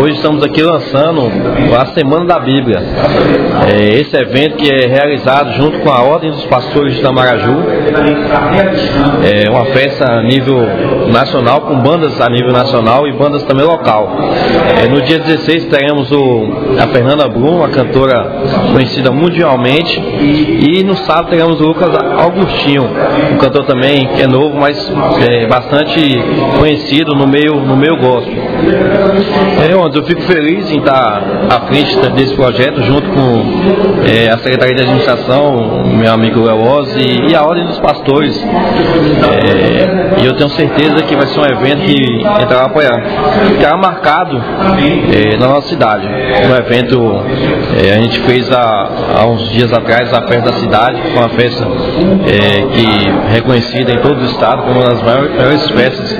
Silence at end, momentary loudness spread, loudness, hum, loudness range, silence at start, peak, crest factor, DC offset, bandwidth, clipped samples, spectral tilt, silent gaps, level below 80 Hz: 0 s; 3 LU; -9 LUFS; none; 1 LU; 0 s; 0 dBFS; 8 dB; 0.3%; 5.4 kHz; 1%; -8 dB/octave; none; -32 dBFS